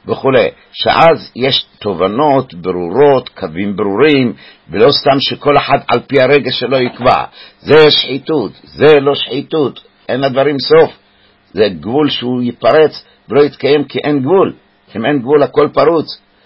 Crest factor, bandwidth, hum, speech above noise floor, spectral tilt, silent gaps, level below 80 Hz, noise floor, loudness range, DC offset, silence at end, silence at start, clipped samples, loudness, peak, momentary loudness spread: 12 dB; 5.8 kHz; none; 38 dB; -7.5 dB/octave; none; -46 dBFS; -50 dBFS; 2 LU; under 0.1%; 0.3 s; 0.05 s; under 0.1%; -11 LUFS; 0 dBFS; 10 LU